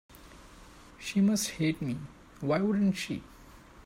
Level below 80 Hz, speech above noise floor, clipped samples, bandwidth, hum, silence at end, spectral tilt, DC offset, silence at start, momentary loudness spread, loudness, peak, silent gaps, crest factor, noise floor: -58 dBFS; 24 dB; under 0.1%; 16 kHz; none; 0.05 s; -5.5 dB/octave; under 0.1%; 0.1 s; 14 LU; -30 LUFS; -16 dBFS; none; 16 dB; -53 dBFS